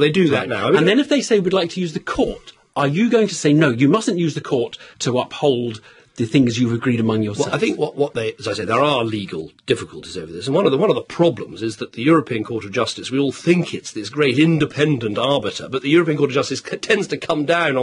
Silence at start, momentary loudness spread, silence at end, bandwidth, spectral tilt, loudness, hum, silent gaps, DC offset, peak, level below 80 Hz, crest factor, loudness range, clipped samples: 0 s; 11 LU; 0 s; 11 kHz; -5.5 dB/octave; -19 LUFS; none; none; under 0.1%; -2 dBFS; -54 dBFS; 16 dB; 3 LU; under 0.1%